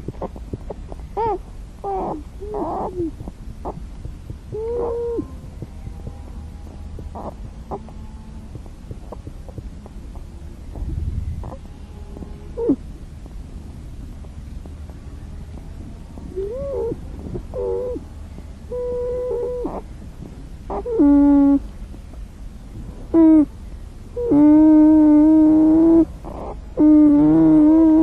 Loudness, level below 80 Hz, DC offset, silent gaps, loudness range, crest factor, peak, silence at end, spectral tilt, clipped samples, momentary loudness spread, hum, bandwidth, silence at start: -17 LUFS; -34 dBFS; under 0.1%; none; 22 LU; 14 dB; -4 dBFS; 0 s; -9.5 dB/octave; under 0.1%; 25 LU; none; 3.9 kHz; 0 s